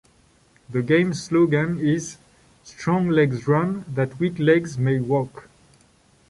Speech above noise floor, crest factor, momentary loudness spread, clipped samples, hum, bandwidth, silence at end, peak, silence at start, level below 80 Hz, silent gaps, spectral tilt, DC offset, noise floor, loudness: 37 dB; 16 dB; 8 LU; under 0.1%; none; 11.5 kHz; 0.9 s; -6 dBFS; 0.7 s; -56 dBFS; none; -7 dB/octave; under 0.1%; -58 dBFS; -22 LUFS